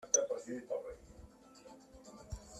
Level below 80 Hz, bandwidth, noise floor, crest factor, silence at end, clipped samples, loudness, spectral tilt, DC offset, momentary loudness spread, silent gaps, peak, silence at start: -60 dBFS; 14 kHz; -58 dBFS; 26 dB; 0 s; under 0.1%; -39 LUFS; -2.5 dB/octave; under 0.1%; 26 LU; none; -16 dBFS; 0 s